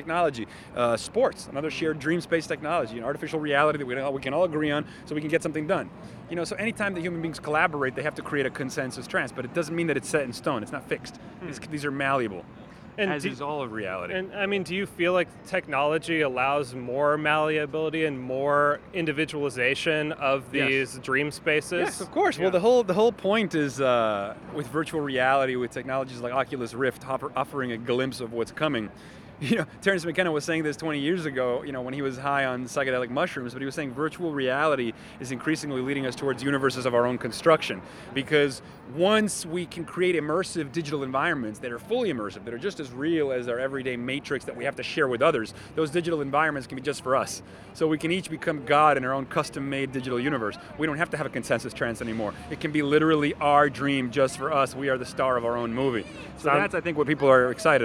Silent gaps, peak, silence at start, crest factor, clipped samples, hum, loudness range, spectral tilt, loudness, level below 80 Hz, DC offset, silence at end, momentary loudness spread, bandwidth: none; -6 dBFS; 0 s; 20 dB; under 0.1%; none; 5 LU; -5 dB/octave; -26 LUFS; -58 dBFS; under 0.1%; 0 s; 10 LU; 15.5 kHz